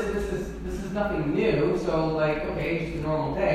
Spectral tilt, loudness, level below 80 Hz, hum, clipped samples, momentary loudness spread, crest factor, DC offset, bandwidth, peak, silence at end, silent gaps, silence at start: -7 dB/octave; -27 LUFS; -40 dBFS; none; under 0.1%; 8 LU; 14 dB; under 0.1%; 14.5 kHz; -12 dBFS; 0 s; none; 0 s